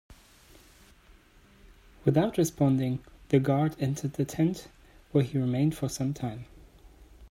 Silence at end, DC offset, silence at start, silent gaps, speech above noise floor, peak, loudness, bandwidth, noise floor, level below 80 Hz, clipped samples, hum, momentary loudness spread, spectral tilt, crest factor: 0.05 s; under 0.1%; 0.1 s; none; 31 dB; -10 dBFS; -28 LUFS; 16 kHz; -58 dBFS; -56 dBFS; under 0.1%; none; 9 LU; -7 dB/octave; 20 dB